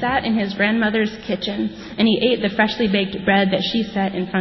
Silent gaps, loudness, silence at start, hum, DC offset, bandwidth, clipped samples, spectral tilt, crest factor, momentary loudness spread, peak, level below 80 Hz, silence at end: none; -19 LUFS; 0 s; none; under 0.1%; 6 kHz; under 0.1%; -6.5 dB/octave; 16 dB; 7 LU; -4 dBFS; -48 dBFS; 0 s